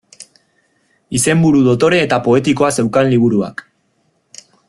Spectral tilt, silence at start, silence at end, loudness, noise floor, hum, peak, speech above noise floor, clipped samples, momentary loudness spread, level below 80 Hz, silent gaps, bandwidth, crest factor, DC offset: -5.5 dB/octave; 0.2 s; 1.15 s; -13 LUFS; -62 dBFS; none; -2 dBFS; 49 dB; under 0.1%; 8 LU; -50 dBFS; none; 12.5 kHz; 14 dB; under 0.1%